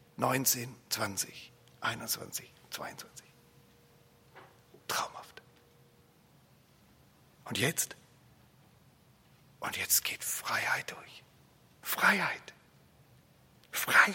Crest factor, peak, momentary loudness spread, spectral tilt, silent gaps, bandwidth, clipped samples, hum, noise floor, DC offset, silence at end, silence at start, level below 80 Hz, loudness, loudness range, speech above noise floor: 26 dB; -10 dBFS; 24 LU; -1.5 dB/octave; none; 16.5 kHz; under 0.1%; none; -63 dBFS; under 0.1%; 0 s; 0.2 s; -74 dBFS; -32 LUFS; 12 LU; 31 dB